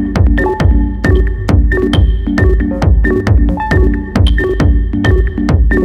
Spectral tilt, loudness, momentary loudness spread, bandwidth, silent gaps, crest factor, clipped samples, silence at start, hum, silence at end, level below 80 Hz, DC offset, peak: -8 dB/octave; -12 LUFS; 2 LU; 9.4 kHz; none; 10 dB; under 0.1%; 0 s; none; 0 s; -12 dBFS; under 0.1%; 0 dBFS